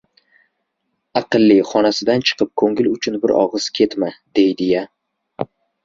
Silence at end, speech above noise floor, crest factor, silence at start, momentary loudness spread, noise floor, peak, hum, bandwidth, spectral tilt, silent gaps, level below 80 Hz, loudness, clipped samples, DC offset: 0.4 s; 57 dB; 16 dB; 1.15 s; 14 LU; -73 dBFS; -2 dBFS; none; 7.6 kHz; -5 dB/octave; none; -58 dBFS; -17 LUFS; under 0.1%; under 0.1%